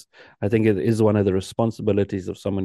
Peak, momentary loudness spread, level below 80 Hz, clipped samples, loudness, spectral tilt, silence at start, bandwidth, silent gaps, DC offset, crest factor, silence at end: -6 dBFS; 9 LU; -58 dBFS; under 0.1%; -22 LUFS; -7.5 dB/octave; 0.4 s; 12.5 kHz; none; under 0.1%; 16 dB; 0 s